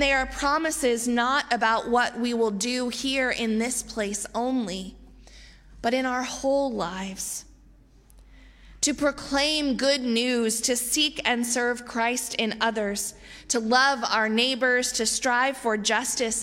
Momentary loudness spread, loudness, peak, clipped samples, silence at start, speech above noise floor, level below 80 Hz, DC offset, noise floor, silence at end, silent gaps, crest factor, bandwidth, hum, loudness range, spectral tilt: 7 LU; -24 LUFS; -6 dBFS; under 0.1%; 0 s; 29 dB; -50 dBFS; under 0.1%; -54 dBFS; 0 s; none; 20 dB; 16.5 kHz; none; 6 LU; -2 dB/octave